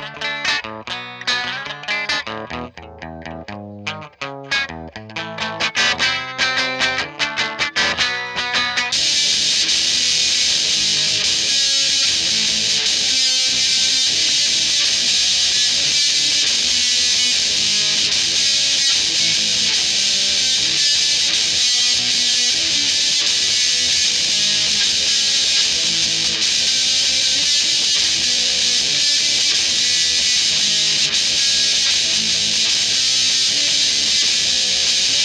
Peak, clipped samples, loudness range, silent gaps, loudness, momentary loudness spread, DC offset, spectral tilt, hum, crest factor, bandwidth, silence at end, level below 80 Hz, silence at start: -4 dBFS; under 0.1%; 8 LU; none; -14 LUFS; 9 LU; under 0.1%; 1 dB/octave; none; 14 dB; 16 kHz; 0 s; -52 dBFS; 0 s